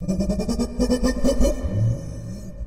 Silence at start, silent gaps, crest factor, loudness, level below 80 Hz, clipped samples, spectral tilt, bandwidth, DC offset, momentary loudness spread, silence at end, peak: 0 s; none; 16 dB; -23 LUFS; -28 dBFS; under 0.1%; -6.5 dB/octave; 15 kHz; under 0.1%; 11 LU; 0 s; -6 dBFS